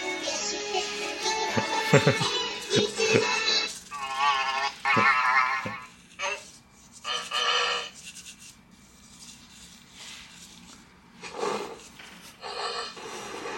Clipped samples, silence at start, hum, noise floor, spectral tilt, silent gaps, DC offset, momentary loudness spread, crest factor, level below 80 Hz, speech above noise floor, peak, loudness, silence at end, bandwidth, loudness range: under 0.1%; 0 s; none; -54 dBFS; -3 dB/octave; none; under 0.1%; 24 LU; 26 dB; -64 dBFS; 30 dB; -2 dBFS; -26 LUFS; 0 s; 16.5 kHz; 15 LU